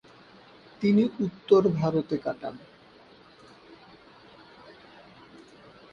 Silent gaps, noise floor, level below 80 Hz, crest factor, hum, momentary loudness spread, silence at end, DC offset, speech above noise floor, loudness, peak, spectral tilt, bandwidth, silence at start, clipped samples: none; -54 dBFS; -64 dBFS; 22 dB; none; 18 LU; 1.2 s; under 0.1%; 29 dB; -26 LUFS; -8 dBFS; -8.5 dB/octave; 7 kHz; 0.8 s; under 0.1%